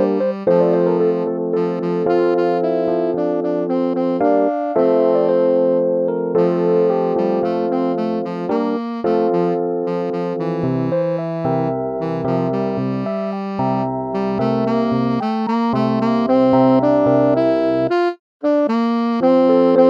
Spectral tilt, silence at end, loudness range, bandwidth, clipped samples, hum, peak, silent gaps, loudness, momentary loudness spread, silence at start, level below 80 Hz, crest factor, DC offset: -9 dB/octave; 0 s; 5 LU; 7 kHz; under 0.1%; none; -2 dBFS; 18.19-18.40 s; -18 LUFS; 7 LU; 0 s; -56 dBFS; 16 dB; under 0.1%